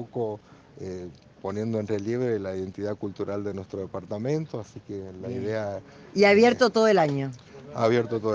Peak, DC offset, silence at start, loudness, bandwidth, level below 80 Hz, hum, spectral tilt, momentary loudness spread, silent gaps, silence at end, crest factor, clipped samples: -6 dBFS; under 0.1%; 0 s; -26 LUFS; 7.8 kHz; -66 dBFS; none; -6 dB/octave; 18 LU; none; 0 s; 20 dB; under 0.1%